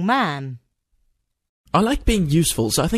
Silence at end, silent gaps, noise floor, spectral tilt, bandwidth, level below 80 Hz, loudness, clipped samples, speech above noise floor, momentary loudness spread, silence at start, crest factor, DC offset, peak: 0 s; 1.49-1.64 s; -68 dBFS; -4.5 dB/octave; 14 kHz; -32 dBFS; -20 LUFS; under 0.1%; 49 dB; 9 LU; 0 s; 18 dB; under 0.1%; -2 dBFS